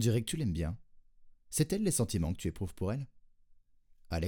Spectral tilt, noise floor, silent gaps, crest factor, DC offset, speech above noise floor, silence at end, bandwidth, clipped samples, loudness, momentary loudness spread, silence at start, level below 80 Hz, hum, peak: -5.5 dB/octave; -62 dBFS; none; 18 dB; under 0.1%; 30 dB; 0 s; over 20 kHz; under 0.1%; -34 LUFS; 10 LU; 0 s; -52 dBFS; none; -16 dBFS